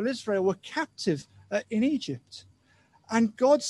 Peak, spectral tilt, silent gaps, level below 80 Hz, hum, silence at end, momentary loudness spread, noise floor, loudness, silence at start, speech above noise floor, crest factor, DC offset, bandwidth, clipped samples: -10 dBFS; -5 dB/octave; none; -70 dBFS; none; 0 s; 12 LU; -63 dBFS; -28 LUFS; 0 s; 36 dB; 18 dB; under 0.1%; 11.5 kHz; under 0.1%